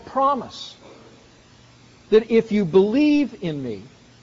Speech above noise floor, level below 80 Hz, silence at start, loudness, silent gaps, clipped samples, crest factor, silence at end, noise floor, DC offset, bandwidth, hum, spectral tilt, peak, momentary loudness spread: 31 dB; -56 dBFS; 0.05 s; -20 LUFS; none; under 0.1%; 16 dB; 0.4 s; -50 dBFS; under 0.1%; 7.6 kHz; none; -5.5 dB/octave; -6 dBFS; 18 LU